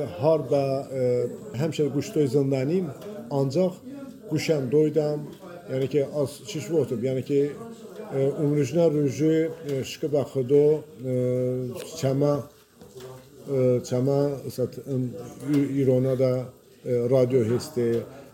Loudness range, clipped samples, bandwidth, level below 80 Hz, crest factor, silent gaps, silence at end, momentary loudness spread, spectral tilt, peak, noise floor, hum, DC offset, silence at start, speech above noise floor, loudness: 3 LU; under 0.1%; 17 kHz; -64 dBFS; 16 dB; none; 0.05 s; 13 LU; -7.5 dB/octave; -8 dBFS; -46 dBFS; none; under 0.1%; 0 s; 22 dB; -25 LUFS